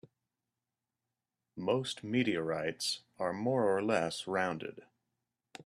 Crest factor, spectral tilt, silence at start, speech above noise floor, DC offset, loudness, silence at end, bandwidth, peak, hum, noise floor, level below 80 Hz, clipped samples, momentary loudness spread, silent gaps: 20 dB; -4.5 dB/octave; 1.55 s; 56 dB; under 0.1%; -34 LUFS; 0.05 s; 14 kHz; -16 dBFS; none; -90 dBFS; -76 dBFS; under 0.1%; 9 LU; none